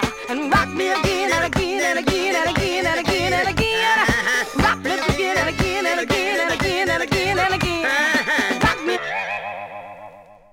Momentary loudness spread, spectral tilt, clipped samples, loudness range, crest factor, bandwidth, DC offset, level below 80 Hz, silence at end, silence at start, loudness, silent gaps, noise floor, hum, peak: 7 LU; -4 dB/octave; under 0.1%; 1 LU; 14 dB; 17 kHz; under 0.1%; -38 dBFS; 0.2 s; 0 s; -19 LUFS; none; -42 dBFS; none; -6 dBFS